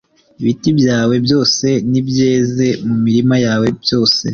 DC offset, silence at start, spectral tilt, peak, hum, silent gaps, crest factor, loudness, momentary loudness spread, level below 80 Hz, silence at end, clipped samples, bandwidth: under 0.1%; 0.4 s; -5.5 dB/octave; -2 dBFS; none; none; 12 dB; -14 LUFS; 4 LU; -48 dBFS; 0 s; under 0.1%; 7.2 kHz